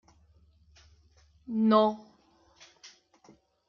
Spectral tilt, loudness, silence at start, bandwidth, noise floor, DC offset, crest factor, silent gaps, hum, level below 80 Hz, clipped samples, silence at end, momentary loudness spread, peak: -7 dB/octave; -26 LUFS; 1.5 s; 6.8 kHz; -64 dBFS; under 0.1%; 22 dB; none; none; -68 dBFS; under 0.1%; 0.8 s; 28 LU; -10 dBFS